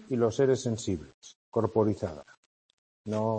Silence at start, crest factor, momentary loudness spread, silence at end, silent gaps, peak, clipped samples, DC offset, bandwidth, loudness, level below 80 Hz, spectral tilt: 0 s; 18 dB; 18 LU; 0 s; 1.14-1.22 s, 1.35-1.52 s, 2.37-3.04 s; -12 dBFS; under 0.1%; under 0.1%; 8.8 kHz; -29 LUFS; -60 dBFS; -6.5 dB/octave